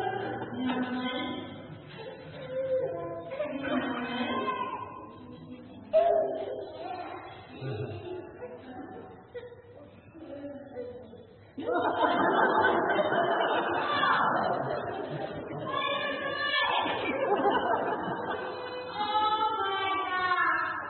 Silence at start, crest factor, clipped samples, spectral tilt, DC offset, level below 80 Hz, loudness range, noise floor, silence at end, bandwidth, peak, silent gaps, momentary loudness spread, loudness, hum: 0 s; 18 dB; under 0.1%; -2 dB/octave; under 0.1%; -68 dBFS; 15 LU; -51 dBFS; 0 s; 4.3 kHz; -12 dBFS; none; 20 LU; -30 LUFS; none